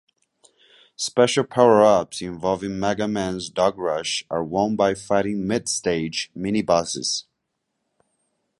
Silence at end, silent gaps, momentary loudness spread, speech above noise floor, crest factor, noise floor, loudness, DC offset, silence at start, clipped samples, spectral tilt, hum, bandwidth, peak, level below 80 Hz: 1.4 s; none; 10 LU; 56 dB; 20 dB; -77 dBFS; -22 LUFS; under 0.1%; 1 s; under 0.1%; -4 dB/octave; none; 11.5 kHz; -2 dBFS; -54 dBFS